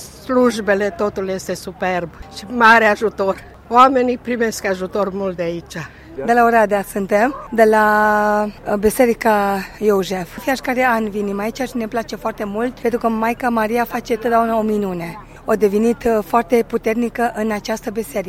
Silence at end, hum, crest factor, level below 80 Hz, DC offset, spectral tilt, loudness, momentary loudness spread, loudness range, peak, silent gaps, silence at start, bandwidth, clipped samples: 0 s; none; 18 dB; -44 dBFS; under 0.1%; -5 dB/octave; -17 LUFS; 12 LU; 5 LU; 0 dBFS; none; 0 s; 16.5 kHz; under 0.1%